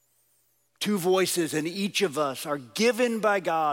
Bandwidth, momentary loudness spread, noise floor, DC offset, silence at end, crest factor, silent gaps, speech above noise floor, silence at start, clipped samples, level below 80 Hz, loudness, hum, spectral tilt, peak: 17 kHz; 6 LU; -69 dBFS; under 0.1%; 0 s; 14 dB; none; 43 dB; 0.8 s; under 0.1%; -80 dBFS; -26 LUFS; none; -3.5 dB/octave; -12 dBFS